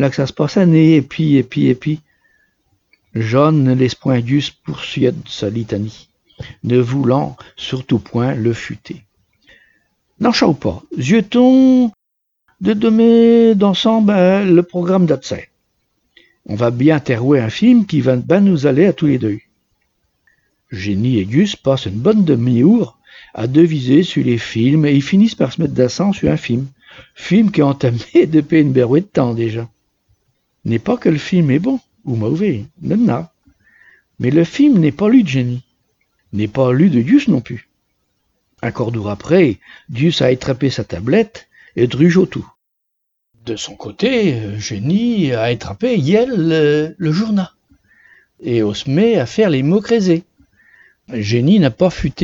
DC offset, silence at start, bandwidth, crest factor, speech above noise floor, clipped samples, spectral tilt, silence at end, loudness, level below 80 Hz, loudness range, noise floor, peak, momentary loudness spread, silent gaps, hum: under 0.1%; 0 s; 7.6 kHz; 14 dB; 60 dB; under 0.1%; -7.5 dB/octave; 0 s; -14 LUFS; -48 dBFS; 6 LU; -73 dBFS; 0 dBFS; 13 LU; none; none